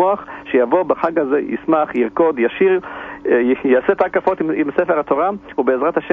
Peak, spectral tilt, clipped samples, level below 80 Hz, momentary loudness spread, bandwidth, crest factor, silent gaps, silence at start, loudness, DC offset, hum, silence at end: -2 dBFS; -8.5 dB/octave; under 0.1%; -54 dBFS; 5 LU; 3.9 kHz; 14 dB; none; 0 s; -17 LUFS; under 0.1%; none; 0 s